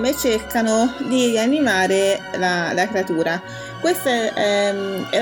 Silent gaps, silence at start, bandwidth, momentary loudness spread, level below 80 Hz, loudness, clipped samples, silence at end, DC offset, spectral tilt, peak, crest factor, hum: none; 0 s; 18 kHz; 5 LU; -52 dBFS; -19 LUFS; under 0.1%; 0 s; under 0.1%; -3.5 dB/octave; -4 dBFS; 16 dB; none